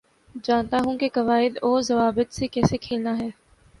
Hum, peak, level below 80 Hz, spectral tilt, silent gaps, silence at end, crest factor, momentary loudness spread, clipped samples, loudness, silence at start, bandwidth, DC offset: none; -4 dBFS; -50 dBFS; -6 dB/octave; none; 0.5 s; 20 dB; 8 LU; under 0.1%; -23 LUFS; 0.35 s; 11.5 kHz; under 0.1%